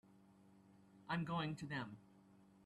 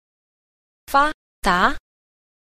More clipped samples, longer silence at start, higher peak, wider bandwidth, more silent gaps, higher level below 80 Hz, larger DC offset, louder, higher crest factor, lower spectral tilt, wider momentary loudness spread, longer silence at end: neither; second, 0.05 s vs 0.9 s; second, -32 dBFS vs -4 dBFS; second, 11.5 kHz vs 15 kHz; second, none vs 1.14-1.42 s; second, -76 dBFS vs -40 dBFS; neither; second, -45 LUFS vs -20 LUFS; about the same, 18 dB vs 20 dB; first, -6.5 dB/octave vs -4 dB/octave; first, 20 LU vs 7 LU; second, 0 s vs 0.8 s